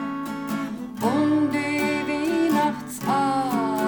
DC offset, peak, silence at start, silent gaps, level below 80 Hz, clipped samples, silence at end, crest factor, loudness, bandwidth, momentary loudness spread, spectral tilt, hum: under 0.1%; -10 dBFS; 0 s; none; -58 dBFS; under 0.1%; 0 s; 12 dB; -24 LUFS; 19.5 kHz; 8 LU; -5.5 dB/octave; none